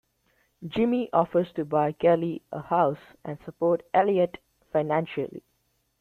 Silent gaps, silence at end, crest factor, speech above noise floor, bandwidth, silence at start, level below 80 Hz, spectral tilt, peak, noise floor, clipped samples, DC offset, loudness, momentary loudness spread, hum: none; 0.6 s; 20 dB; 47 dB; 4.4 kHz; 0.6 s; -64 dBFS; -9 dB/octave; -8 dBFS; -72 dBFS; under 0.1%; under 0.1%; -26 LUFS; 15 LU; none